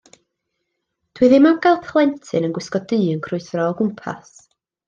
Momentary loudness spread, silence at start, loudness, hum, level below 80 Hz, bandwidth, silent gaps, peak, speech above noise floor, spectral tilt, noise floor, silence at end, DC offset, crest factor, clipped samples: 13 LU; 1.15 s; -18 LUFS; none; -62 dBFS; 7.6 kHz; none; -2 dBFS; 58 dB; -7 dB/octave; -76 dBFS; 0.7 s; under 0.1%; 18 dB; under 0.1%